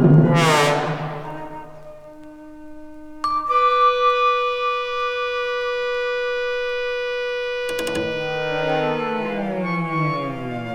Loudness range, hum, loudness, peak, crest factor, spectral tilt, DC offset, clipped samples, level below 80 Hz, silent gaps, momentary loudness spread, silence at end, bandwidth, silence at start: 4 LU; none; -21 LUFS; -2 dBFS; 18 dB; -5.5 dB/octave; under 0.1%; under 0.1%; -50 dBFS; none; 25 LU; 0 s; 15 kHz; 0 s